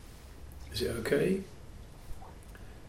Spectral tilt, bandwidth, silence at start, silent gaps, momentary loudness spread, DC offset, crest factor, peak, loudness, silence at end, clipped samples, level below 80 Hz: -5.5 dB/octave; 16.5 kHz; 0 s; none; 22 LU; under 0.1%; 22 dB; -16 dBFS; -32 LUFS; 0 s; under 0.1%; -50 dBFS